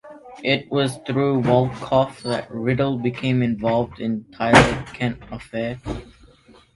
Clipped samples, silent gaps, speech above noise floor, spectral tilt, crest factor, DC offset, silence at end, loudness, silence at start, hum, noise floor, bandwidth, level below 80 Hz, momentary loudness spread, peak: under 0.1%; none; 30 dB; -6 dB/octave; 22 dB; under 0.1%; 0.65 s; -21 LUFS; 0.05 s; none; -51 dBFS; 11.5 kHz; -42 dBFS; 13 LU; 0 dBFS